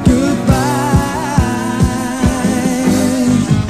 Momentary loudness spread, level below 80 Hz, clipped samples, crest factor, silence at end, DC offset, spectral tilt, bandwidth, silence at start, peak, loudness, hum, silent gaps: 3 LU; -24 dBFS; under 0.1%; 12 dB; 0 s; 0.4%; -6 dB/octave; 13 kHz; 0 s; 0 dBFS; -14 LUFS; none; none